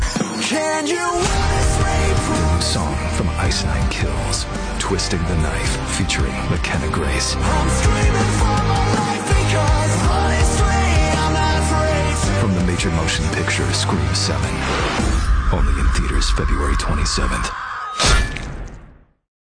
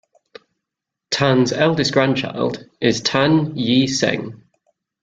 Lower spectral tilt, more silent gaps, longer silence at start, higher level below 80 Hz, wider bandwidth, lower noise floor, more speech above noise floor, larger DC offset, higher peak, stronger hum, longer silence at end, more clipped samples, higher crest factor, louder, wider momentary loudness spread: about the same, -4.5 dB/octave vs -5 dB/octave; neither; second, 0 s vs 1.1 s; first, -22 dBFS vs -56 dBFS; about the same, 10 kHz vs 9.2 kHz; second, -44 dBFS vs -83 dBFS; second, 26 dB vs 66 dB; neither; about the same, -4 dBFS vs -2 dBFS; neither; about the same, 0.55 s vs 0.65 s; neither; second, 12 dB vs 18 dB; about the same, -18 LUFS vs -18 LUFS; second, 5 LU vs 8 LU